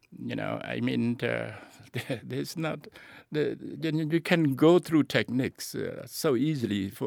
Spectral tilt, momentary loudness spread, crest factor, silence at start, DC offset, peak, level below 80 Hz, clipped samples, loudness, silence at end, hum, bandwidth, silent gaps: -6 dB/octave; 14 LU; 20 dB; 0.1 s; under 0.1%; -8 dBFS; -68 dBFS; under 0.1%; -29 LUFS; 0 s; none; 19.5 kHz; none